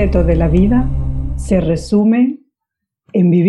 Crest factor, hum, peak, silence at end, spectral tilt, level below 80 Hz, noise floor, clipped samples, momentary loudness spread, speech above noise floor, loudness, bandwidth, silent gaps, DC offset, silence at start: 14 dB; none; 0 dBFS; 0 s; -8.5 dB/octave; -22 dBFS; -80 dBFS; under 0.1%; 9 LU; 68 dB; -15 LUFS; 11 kHz; none; under 0.1%; 0 s